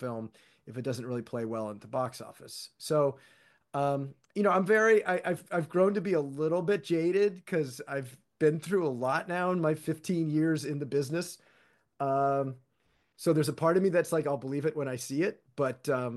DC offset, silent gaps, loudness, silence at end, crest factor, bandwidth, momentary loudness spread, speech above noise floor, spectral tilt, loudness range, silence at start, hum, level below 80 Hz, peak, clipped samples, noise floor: under 0.1%; none; -30 LUFS; 0 s; 18 dB; 12.5 kHz; 12 LU; 43 dB; -6 dB/octave; 6 LU; 0 s; none; -78 dBFS; -12 dBFS; under 0.1%; -73 dBFS